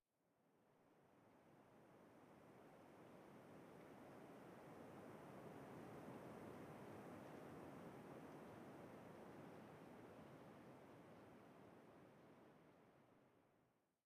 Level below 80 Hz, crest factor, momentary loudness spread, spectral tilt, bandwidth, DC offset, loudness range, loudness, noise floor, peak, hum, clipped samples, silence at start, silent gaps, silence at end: under -90 dBFS; 16 dB; 9 LU; -6.5 dB/octave; 15.5 kHz; under 0.1%; 8 LU; -62 LUFS; -84 dBFS; -46 dBFS; none; under 0.1%; 0.25 s; none; 0.2 s